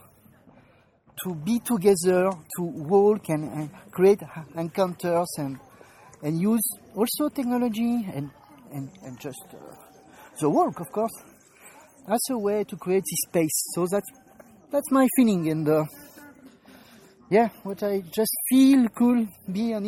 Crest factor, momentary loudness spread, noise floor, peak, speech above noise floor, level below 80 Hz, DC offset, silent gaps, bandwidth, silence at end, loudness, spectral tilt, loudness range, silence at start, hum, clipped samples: 18 dB; 18 LU; -59 dBFS; -6 dBFS; 35 dB; -64 dBFS; under 0.1%; none; 17 kHz; 0 s; -24 LUFS; -5.5 dB/octave; 7 LU; 1.15 s; none; under 0.1%